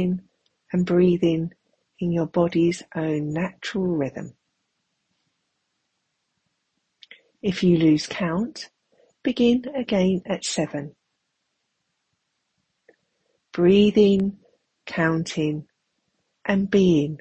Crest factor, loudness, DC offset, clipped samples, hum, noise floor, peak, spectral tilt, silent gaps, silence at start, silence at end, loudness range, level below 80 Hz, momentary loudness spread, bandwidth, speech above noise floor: 18 dB; -22 LUFS; under 0.1%; under 0.1%; none; -76 dBFS; -6 dBFS; -6.5 dB/octave; none; 0 s; 0.05 s; 10 LU; -56 dBFS; 14 LU; 8.8 kHz; 55 dB